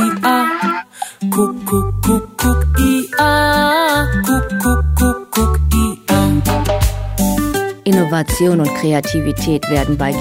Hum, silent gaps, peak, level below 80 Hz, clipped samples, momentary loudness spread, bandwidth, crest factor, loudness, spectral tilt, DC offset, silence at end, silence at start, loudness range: none; none; 0 dBFS; -22 dBFS; under 0.1%; 6 LU; 16.5 kHz; 14 dB; -15 LUFS; -5.5 dB/octave; under 0.1%; 0 s; 0 s; 2 LU